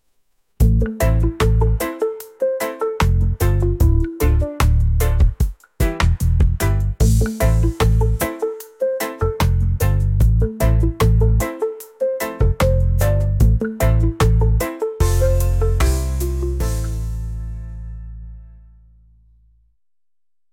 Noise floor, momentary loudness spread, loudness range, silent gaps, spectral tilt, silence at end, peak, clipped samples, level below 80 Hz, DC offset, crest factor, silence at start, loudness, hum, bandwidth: under -90 dBFS; 9 LU; 6 LU; none; -6.5 dB/octave; 2.05 s; -4 dBFS; under 0.1%; -20 dBFS; under 0.1%; 14 dB; 0.6 s; -19 LUFS; none; 17 kHz